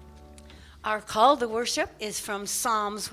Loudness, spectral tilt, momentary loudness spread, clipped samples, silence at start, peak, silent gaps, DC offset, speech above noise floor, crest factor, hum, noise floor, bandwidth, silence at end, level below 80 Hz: -26 LUFS; -2 dB/octave; 10 LU; under 0.1%; 0 s; -8 dBFS; none; under 0.1%; 22 dB; 20 dB; none; -48 dBFS; 16 kHz; 0 s; -54 dBFS